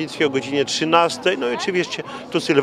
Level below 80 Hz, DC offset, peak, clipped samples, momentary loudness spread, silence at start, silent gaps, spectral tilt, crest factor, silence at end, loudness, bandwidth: -64 dBFS; under 0.1%; 0 dBFS; under 0.1%; 9 LU; 0 s; none; -4 dB/octave; 20 dB; 0 s; -20 LUFS; 14 kHz